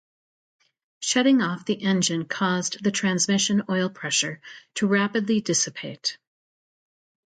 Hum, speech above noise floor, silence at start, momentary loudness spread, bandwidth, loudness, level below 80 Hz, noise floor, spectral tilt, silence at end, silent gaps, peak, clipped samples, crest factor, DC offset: none; over 66 dB; 1 s; 9 LU; 9.4 kHz; -23 LUFS; -70 dBFS; under -90 dBFS; -3.5 dB/octave; 1.15 s; none; -8 dBFS; under 0.1%; 18 dB; under 0.1%